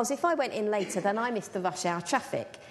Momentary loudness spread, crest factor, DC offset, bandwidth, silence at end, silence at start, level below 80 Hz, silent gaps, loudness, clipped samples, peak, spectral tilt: 5 LU; 18 dB; under 0.1%; 12.5 kHz; 0 s; 0 s; -74 dBFS; none; -30 LUFS; under 0.1%; -12 dBFS; -4 dB/octave